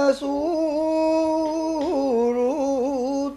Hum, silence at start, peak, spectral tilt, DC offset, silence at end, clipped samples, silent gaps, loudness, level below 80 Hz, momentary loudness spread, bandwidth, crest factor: none; 0 s; -8 dBFS; -5 dB/octave; under 0.1%; 0 s; under 0.1%; none; -22 LUFS; -54 dBFS; 3 LU; 12 kHz; 14 dB